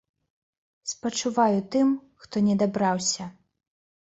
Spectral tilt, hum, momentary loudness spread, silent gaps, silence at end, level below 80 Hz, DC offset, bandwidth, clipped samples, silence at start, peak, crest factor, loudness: -4.5 dB/octave; none; 11 LU; none; 0.85 s; -66 dBFS; under 0.1%; 8.2 kHz; under 0.1%; 0.85 s; -8 dBFS; 18 dB; -25 LUFS